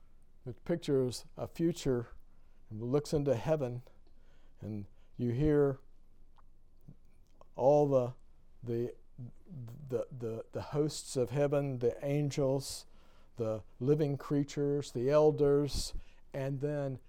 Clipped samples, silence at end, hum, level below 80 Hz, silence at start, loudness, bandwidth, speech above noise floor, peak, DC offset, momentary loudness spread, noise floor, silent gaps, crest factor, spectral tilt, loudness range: under 0.1%; 0 s; none; -52 dBFS; 0 s; -33 LUFS; 16 kHz; 23 dB; -16 dBFS; under 0.1%; 20 LU; -56 dBFS; none; 18 dB; -6.5 dB/octave; 5 LU